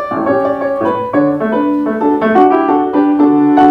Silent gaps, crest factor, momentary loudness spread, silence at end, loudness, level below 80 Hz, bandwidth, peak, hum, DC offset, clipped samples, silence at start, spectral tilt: none; 12 dB; 6 LU; 0 s; -12 LUFS; -50 dBFS; 4.9 kHz; 0 dBFS; none; under 0.1%; 0.1%; 0 s; -8.5 dB/octave